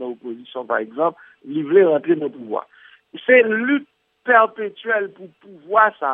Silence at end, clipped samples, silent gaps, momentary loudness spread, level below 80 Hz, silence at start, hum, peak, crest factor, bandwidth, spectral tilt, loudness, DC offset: 0 s; under 0.1%; none; 16 LU; -80 dBFS; 0 s; none; 0 dBFS; 18 dB; 3.8 kHz; -9 dB/octave; -18 LUFS; under 0.1%